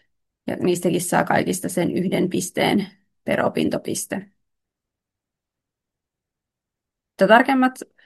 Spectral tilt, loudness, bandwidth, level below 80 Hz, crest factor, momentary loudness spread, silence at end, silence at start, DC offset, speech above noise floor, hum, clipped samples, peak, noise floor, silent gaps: -4.5 dB/octave; -20 LUFS; 12.5 kHz; -64 dBFS; 22 dB; 15 LU; 0.2 s; 0.45 s; under 0.1%; 65 dB; none; under 0.1%; -2 dBFS; -85 dBFS; none